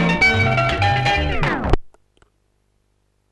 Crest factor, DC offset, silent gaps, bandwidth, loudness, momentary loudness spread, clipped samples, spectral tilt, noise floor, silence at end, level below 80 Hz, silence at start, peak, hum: 20 dB; under 0.1%; none; 12 kHz; -18 LUFS; 8 LU; under 0.1%; -5.5 dB/octave; -65 dBFS; 1.45 s; -30 dBFS; 0 s; 0 dBFS; 50 Hz at -40 dBFS